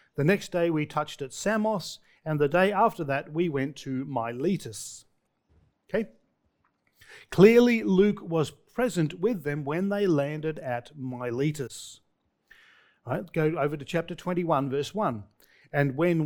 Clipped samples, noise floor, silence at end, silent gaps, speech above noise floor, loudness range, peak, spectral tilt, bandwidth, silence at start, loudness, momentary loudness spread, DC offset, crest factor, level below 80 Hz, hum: under 0.1%; -72 dBFS; 0 s; none; 46 dB; 9 LU; -4 dBFS; -6.5 dB/octave; 19.5 kHz; 0.15 s; -27 LUFS; 13 LU; under 0.1%; 22 dB; -60 dBFS; none